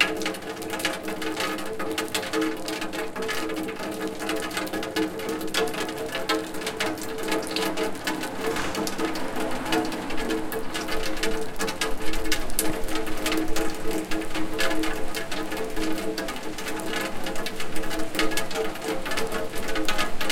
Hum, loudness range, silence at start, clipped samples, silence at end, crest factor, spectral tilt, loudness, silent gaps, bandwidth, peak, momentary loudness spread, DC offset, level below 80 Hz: none; 2 LU; 0 s; under 0.1%; 0 s; 20 dB; -3 dB/octave; -28 LUFS; none; 17 kHz; -4 dBFS; 5 LU; under 0.1%; -38 dBFS